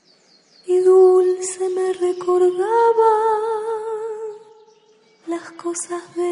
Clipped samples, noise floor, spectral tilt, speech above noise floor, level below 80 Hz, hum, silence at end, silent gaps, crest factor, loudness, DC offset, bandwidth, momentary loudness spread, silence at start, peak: under 0.1%; -55 dBFS; -3.5 dB/octave; 37 dB; -74 dBFS; none; 0 s; none; 14 dB; -18 LUFS; under 0.1%; 11 kHz; 16 LU; 0.65 s; -4 dBFS